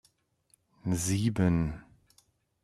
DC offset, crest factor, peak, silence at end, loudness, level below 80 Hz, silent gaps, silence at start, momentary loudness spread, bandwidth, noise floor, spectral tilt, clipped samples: under 0.1%; 20 dB; -14 dBFS; 0.8 s; -30 LUFS; -52 dBFS; none; 0.85 s; 12 LU; 14 kHz; -70 dBFS; -6 dB/octave; under 0.1%